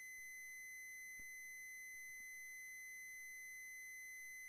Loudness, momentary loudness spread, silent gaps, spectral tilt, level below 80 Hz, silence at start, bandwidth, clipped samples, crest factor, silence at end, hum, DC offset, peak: -52 LUFS; 0 LU; none; 2 dB/octave; -84 dBFS; 0 s; 15.5 kHz; under 0.1%; 6 dB; 0 s; none; under 0.1%; -48 dBFS